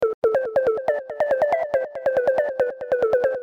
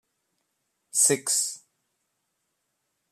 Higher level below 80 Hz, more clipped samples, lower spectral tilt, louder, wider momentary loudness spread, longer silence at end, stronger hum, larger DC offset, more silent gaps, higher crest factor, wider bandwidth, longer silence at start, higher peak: first, -58 dBFS vs -82 dBFS; neither; first, -6 dB/octave vs -1 dB/octave; about the same, -22 LUFS vs -23 LUFS; second, 4 LU vs 12 LU; second, 0 s vs 1.55 s; neither; neither; first, 0.14-0.22 s vs none; second, 12 dB vs 22 dB; second, 7.4 kHz vs 14.5 kHz; second, 0 s vs 0.95 s; about the same, -10 dBFS vs -8 dBFS